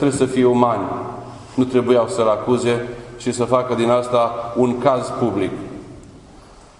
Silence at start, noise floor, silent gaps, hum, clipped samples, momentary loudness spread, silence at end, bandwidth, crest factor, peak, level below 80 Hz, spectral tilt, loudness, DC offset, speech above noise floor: 0 s; -43 dBFS; none; none; under 0.1%; 15 LU; 0.25 s; 11 kHz; 18 dB; 0 dBFS; -50 dBFS; -6 dB/octave; -18 LUFS; under 0.1%; 26 dB